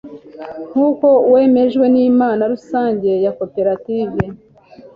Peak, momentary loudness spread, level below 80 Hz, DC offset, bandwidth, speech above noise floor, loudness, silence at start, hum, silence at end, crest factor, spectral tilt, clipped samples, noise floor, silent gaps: -2 dBFS; 12 LU; -50 dBFS; under 0.1%; 5.2 kHz; 28 dB; -15 LUFS; 0.05 s; none; 0.1 s; 12 dB; -9 dB/octave; under 0.1%; -42 dBFS; none